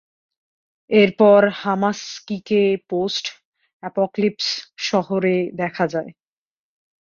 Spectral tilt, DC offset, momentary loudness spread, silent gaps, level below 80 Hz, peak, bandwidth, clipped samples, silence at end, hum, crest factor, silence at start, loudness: -5 dB/octave; under 0.1%; 15 LU; 3.45-3.52 s, 3.73-3.80 s; -66 dBFS; -2 dBFS; 7.4 kHz; under 0.1%; 0.9 s; none; 18 dB; 0.9 s; -19 LUFS